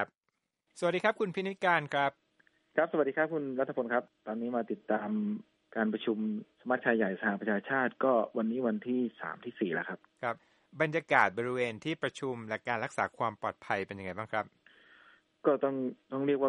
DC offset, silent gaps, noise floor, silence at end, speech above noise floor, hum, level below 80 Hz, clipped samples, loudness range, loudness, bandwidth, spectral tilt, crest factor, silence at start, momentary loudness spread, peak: under 0.1%; none; -83 dBFS; 0 s; 51 dB; none; -80 dBFS; under 0.1%; 4 LU; -33 LUFS; 11 kHz; -6.5 dB/octave; 24 dB; 0 s; 9 LU; -10 dBFS